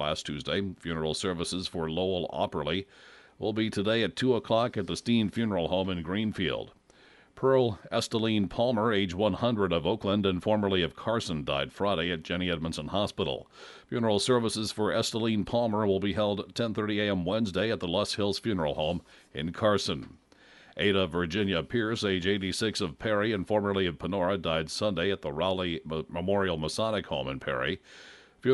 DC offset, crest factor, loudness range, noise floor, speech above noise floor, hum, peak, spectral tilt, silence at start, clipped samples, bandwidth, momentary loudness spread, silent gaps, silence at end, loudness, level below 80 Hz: under 0.1%; 18 dB; 3 LU; -58 dBFS; 29 dB; none; -12 dBFS; -5 dB/octave; 0 s; under 0.1%; 11.5 kHz; 7 LU; none; 0 s; -29 LUFS; -54 dBFS